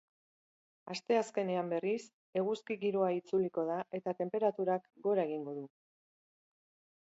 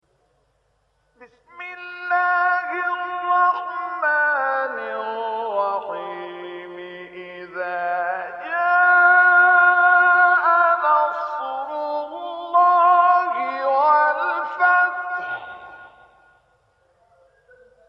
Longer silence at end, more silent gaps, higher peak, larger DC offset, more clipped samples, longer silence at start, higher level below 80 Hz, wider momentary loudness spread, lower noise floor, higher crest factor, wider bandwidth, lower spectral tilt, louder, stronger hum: second, 1.35 s vs 2 s; first, 2.13-2.33 s vs none; second, -18 dBFS vs -4 dBFS; neither; neither; second, 0.85 s vs 1.2 s; second, -86 dBFS vs -72 dBFS; second, 8 LU vs 20 LU; first, under -90 dBFS vs -66 dBFS; about the same, 18 dB vs 16 dB; first, 7.6 kHz vs 5.8 kHz; about the same, -5.5 dB/octave vs -4.5 dB/octave; second, -35 LUFS vs -18 LUFS; neither